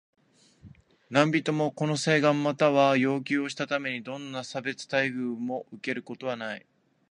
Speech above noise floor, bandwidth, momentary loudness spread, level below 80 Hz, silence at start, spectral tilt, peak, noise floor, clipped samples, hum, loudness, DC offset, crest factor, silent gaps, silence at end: 29 dB; 10.5 kHz; 12 LU; -72 dBFS; 0.65 s; -5.5 dB/octave; -4 dBFS; -56 dBFS; under 0.1%; none; -27 LUFS; under 0.1%; 24 dB; none; 0.55 s